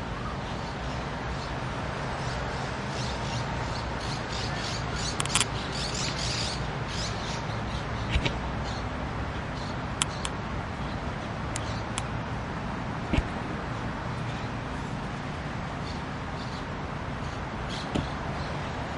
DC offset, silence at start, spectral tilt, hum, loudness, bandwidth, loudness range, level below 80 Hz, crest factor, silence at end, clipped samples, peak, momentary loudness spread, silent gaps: under 0.1%; 0 s; -4 dB/octave; none; -32 LUFS; 11.5 kHz; 5 LU; -40 dBFS; 26 dB; 0 s; under 0.1%; -4 dBFS; 6 LU; none